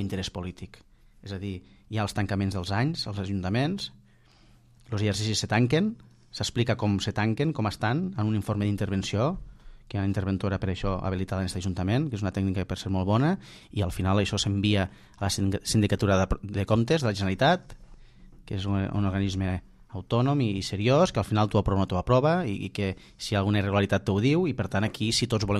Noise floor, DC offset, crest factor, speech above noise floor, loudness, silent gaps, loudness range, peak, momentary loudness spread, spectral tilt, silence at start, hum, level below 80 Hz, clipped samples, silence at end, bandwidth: -57 dBFS; under 0.1%; 18 dB; 31 dB; -27 LUFS; none; 5 LU; -10 dBFS; 11 LU; -6 dB/octave; 0 s; none; -46 dBFS; under 0.1%; 0 s; 13 kHz